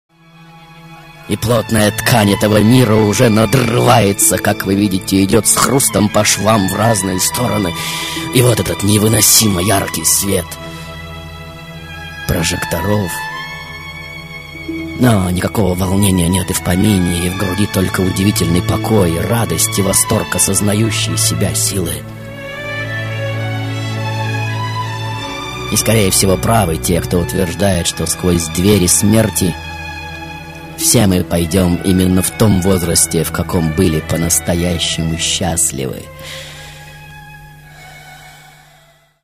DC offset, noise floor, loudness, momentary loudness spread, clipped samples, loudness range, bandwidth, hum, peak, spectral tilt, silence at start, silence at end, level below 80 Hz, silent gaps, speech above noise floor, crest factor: under 0.1%; -49 dBFS; -13 LUFS; 17 LU; under 0.1%; 9 LU; 16 kHz; none; 0 dBFS; -4 dB/octave; 0.4 s; 0.9 s; -36 dBFS; none; 36 dB; 14 dB